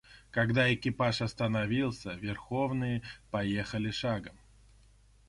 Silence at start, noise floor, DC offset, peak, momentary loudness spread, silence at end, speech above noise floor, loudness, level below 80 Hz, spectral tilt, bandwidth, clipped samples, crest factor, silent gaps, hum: 0.1 s; -61 dBFS; under 0.1%; -14 dBFS; 11 LU; 0.95 s; 29 dB; -32 LUFS; -56 dBFS; -6.5 dB/octave; 11.5 kHz; under 0.1%; 20 dB; none; 50 Hz at -50 dBFS